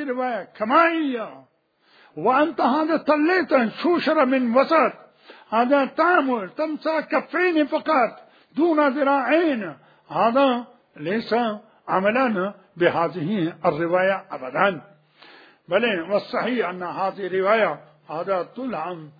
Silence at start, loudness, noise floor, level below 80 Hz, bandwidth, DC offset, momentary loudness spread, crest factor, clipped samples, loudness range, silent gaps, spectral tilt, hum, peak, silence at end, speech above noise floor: 0 s; -22 LUFS; -59 dBFS; -72 dBFS; 5 kHz; under 0.1%; 11 LU; 20 dB; under 0.1%; 4 LU; none; -7.5 dB/octave; none; -2 dBFS; 0.1 s; 38 dB